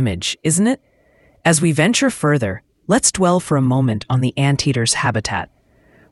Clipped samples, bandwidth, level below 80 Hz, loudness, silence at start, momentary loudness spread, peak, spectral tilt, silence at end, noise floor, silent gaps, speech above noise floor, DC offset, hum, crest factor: under 0.1%; 12 kHz; -46 dBFS; -17 LUFS; 0 s; 9 LU; 0 dBFS; -4.5 dB/octave; 0.65 s; -54 dBFS; none; 38 dB; under 0.1%; none; 18 dB